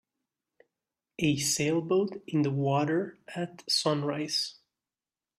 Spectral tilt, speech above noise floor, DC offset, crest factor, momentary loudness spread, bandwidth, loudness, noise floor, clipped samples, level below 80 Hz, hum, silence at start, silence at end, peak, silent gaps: -4.5 dB/octave; over 61 dB; under 0.1%; 16 dB; 11 LU; 13.5 kHz; -29 LUFS; under -90 dBFS; under 0.1%; -66 dBFS; none; 1.2 s; 0.85 s; -14 dBFS; none